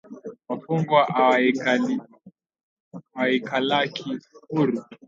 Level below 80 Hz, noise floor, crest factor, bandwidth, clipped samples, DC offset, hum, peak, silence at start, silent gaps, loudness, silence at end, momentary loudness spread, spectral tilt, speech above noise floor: -74 dBFS; -53 dBFS; 20 dB; 7.6 kHz; under 0.1%; under 0.1%; none; -4 dBFS; 0.1 s; 2.63-2.91 s; -23 LUFS; 0.1 s; 15 LU; -6 dB/octave; 31 dB